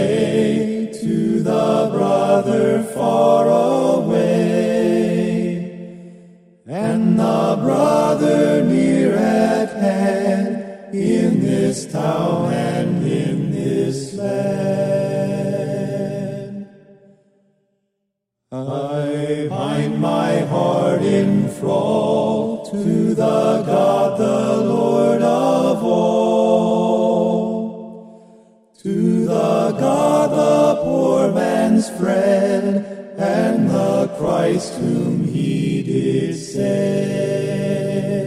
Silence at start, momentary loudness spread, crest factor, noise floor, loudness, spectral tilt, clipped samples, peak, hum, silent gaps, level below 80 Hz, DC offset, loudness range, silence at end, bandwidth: 0 s; 8 LU; 16 dB; -76 dBFS; -18 LUFS; -7 dB/octave; under 0.1%; -2 dBFS; none; none; -56 dBFS; under 0.1%; 6 LU; 0 s; 15 kHz